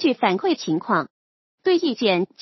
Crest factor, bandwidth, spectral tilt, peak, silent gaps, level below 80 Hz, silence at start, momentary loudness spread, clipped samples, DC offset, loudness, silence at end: 18 dB; 6.2 kHz; -5.5 dB/octave; -4 dBFS; 1.10-1.58 s; -78 dBFS; 0 s; 5 LU; under 0.1%; under 0.1%; -22 LUFS; 0.15 s